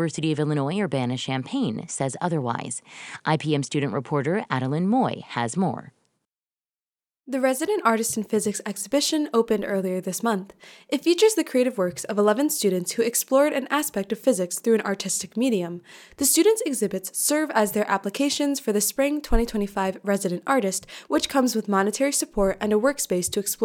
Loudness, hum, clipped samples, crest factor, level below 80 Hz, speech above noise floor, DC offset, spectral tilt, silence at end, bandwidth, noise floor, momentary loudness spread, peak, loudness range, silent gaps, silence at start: -24 LUFS; none; under 0.1%; 18 dB; -42 dBFS; over 66 dB; under 0.1%; -4 dB/octave; 0 s; 18.5 kHz; under -90 dBFS; 7 LU; -6 dBFS; 4 LU; 6.87-6.91 s; 0 s